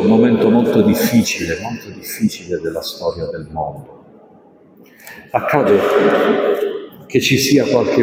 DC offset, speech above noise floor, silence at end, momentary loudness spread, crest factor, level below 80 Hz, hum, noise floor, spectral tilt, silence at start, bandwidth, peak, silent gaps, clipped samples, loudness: under 0.1%; 31 dB; 0 s; 14 LU; 16 dB; -50 dBFS; none; -46 dBFS; -5 dB/octave; 0 s; 16.5 kHz; 0 dBFS; none; under 0.1%; -16 LUFS